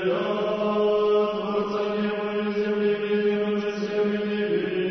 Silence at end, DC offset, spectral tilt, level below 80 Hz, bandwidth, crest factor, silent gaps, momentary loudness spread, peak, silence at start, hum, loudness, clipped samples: 0 s; under 0.1%; -7 dB/octave; -60 dBFS; 6.2 kHz; 12 dB; none; 4 LU; -12 dBFS; 0 s; none; -25 LUFS; under 0.1%